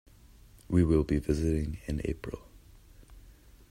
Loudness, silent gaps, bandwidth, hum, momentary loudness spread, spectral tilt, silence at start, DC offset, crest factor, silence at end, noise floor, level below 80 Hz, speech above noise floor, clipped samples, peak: -30 LUFS; none; 15.5 kHz; none; 14 LU; -8 dB/octave; 0.7 s; under 0.1%; 18 dB; 0.4 s; -55 dBFS; -42 dBFS; 27 dB; under 0.1%; -14 dBFS